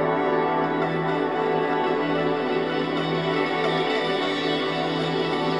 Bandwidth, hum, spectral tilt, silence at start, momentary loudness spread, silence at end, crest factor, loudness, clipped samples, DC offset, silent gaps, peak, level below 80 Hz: 11 kHz; none; -6.5 dB/octave; 0 s; 2 LU; 0 s; 14 dB; -24 LUFS; under 0.1%; 0.2%; none; -10 dBFS; -62 dBFS